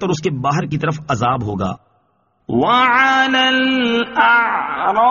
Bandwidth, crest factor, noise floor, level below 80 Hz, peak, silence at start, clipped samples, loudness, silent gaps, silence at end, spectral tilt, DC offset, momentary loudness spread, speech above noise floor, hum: 7.2 kHz; 16 dB; -62 dBFS; -50 dBFS; 0 dBFS; 0 s; under 0.1%; -15 LUFS; none; 0 s; -2.5 dB/octave; under 0.1%; 10 LU; 46 dB; none